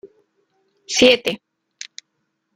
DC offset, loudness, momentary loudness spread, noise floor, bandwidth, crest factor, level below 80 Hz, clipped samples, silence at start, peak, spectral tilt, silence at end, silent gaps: under 0.1%; -16 LUFS; 22 LU; -73 dBFS; 16 kHz; 22 dB; -56 dBFS; under 0.1%; 0.05 s; 0 dBFS; -2 dB/octave; 1.2 s; none